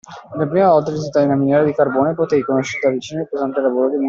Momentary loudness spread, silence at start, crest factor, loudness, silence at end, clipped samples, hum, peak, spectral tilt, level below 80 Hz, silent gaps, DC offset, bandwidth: 9 LU; 0.1 s; 14 dB; -17 LUFS; 0 s; under 0.1%; none; -2 dBFS; -7 dB/octave; -58 dBFS; none; under 0.1%; 7.6 kHz